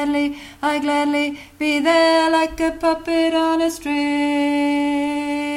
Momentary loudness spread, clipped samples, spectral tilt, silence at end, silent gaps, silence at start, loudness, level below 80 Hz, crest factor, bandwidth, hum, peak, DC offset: 7 LU; under 0.1%; -3.5 dB/octave; 0 s; none; 0 s; -19 LUFS; -48 dBFS; 14 dB; 15.5 kHz; none; -4 dBFS; under 0.1%